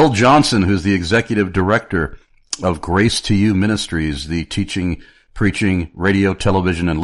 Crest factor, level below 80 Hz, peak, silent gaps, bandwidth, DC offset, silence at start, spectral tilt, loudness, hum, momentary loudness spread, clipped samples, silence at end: 16 dB; -34 dBFS; -2 dBFS; none; 11.5 kHz; under 0.1%; 0 s; -5.5 dB/octave; -17 LUFS; none; 9 LU; under 0.1%; 0 s